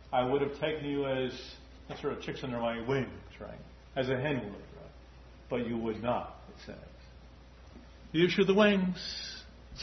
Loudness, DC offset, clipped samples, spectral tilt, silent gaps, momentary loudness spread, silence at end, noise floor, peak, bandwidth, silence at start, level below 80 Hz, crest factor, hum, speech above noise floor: -32 LUFS; under 0.1%; under 0.1%; -4.5 dB/octave; none; 24 LU; 0 s; -53 dBFS; -12 dBFS; 6.2 kHz; 0 s; -54 dBFS; 22 dB; none; 21 dB